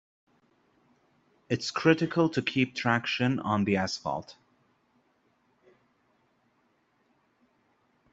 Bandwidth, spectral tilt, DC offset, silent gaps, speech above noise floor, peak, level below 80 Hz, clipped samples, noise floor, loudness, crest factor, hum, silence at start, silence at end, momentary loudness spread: 8 kHz; -5.5 dB/octave; under 0.1%; none; 43 dB; -8 dBFS; -70 dBFS; under 0.1%; -71 dBFS; -28 LUFS; 24 dB; none; 1.5 s; 3.8 s; 9 LU